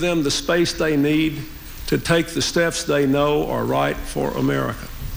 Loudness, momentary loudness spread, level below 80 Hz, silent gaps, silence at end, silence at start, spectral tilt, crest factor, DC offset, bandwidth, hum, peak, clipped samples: -20 LUFS; 7 LU; -36 dBFS; none; 0 s; 0 s; -4.5 dB/octave; 14 dB; under 0.1%; 17 kHz; none; -6 dBFS; under 0.1%